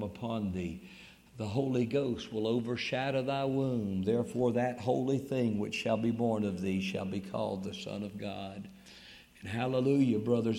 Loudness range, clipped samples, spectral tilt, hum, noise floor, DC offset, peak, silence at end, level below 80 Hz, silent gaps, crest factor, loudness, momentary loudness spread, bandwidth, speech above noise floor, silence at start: 4 LU; under 0.1%; -7 dB/octave; none; -55 dBFS; under 0.1%; -16 dBFS; 0 s; -64 dBFS; none; 16 dB; -33 LUFS; 17 LU; 16 kHz; 22 dB; 0 s